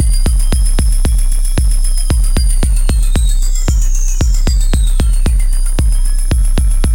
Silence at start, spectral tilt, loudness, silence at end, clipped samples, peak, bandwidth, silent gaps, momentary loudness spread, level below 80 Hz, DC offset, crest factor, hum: 0 s; -4.5 dB/octave; -15 LUFS; 0 s; under 0.1%; -2 dBFS; 16.5 kHz; none; 2 LU; -10 dBFS; under 0.1%; 8 dB; none